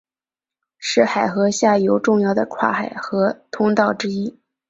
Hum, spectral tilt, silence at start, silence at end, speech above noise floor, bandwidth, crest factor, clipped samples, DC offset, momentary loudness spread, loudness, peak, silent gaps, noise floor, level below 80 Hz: none; -5 dB/octave; 0.8 s; 0.4 s; over 72 dB; 8 kHz; 18 dB; under 0.1%; under 0.1%; 8 LU; -19 LUFS; -2 dBFS; none; under -90 dBFS; -62 dBFS